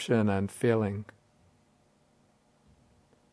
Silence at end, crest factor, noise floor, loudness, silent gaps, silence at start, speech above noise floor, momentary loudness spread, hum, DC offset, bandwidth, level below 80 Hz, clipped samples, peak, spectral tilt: 2.3 s; 22 dB; -67 dBFS; -29 LUFS; none; 0 s; 39 dB; 14 LU; none; under 0.1%; 11 kHz; -72 dBFS; under 0.1%; -12 dBFS; -7 dB/octave